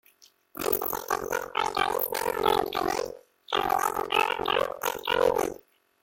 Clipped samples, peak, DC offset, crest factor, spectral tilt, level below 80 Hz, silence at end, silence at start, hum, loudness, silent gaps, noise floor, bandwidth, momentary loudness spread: under 0.1%; -8 dBFS; under 0.1%; 20 dB; -2.5 dB/octave; -56 dBFS; 0.5 s; 0.55 s; none; -27 LUFS; none; -60 dBFS; 17 kHz; 8 LU